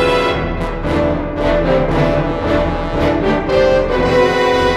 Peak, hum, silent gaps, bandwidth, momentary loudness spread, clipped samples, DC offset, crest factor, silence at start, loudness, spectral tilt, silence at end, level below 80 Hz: -2 dBFS; none; none; 12.5 kHz; 5 LU; under 0.1%; under 0.1%; 12 dB; 0 s; -15 LUFS; -6.5 dB/octave; 0 s; -26 dBFS